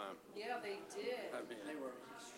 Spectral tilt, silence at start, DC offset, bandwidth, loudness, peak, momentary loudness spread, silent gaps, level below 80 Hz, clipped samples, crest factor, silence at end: -3 dB/octave; 0 s; under 0.1%; 16 kHz; -47 LUFS; -32 dBFS; 5 LU; none; -88 dBFS; under 0.1%; 16 dB; 0 s